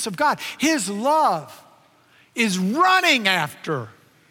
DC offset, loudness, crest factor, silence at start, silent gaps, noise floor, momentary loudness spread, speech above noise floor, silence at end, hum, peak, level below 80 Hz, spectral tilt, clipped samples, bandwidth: under 0.1%; -20 LUFS; 20 dB; 0 s; none; -56 dBFS; 13 LU; 35 dB; 0.4 s; none; -2 dBFS; -74 dBFS; -3.5 dB/octave; under 0.1%; 17 kHz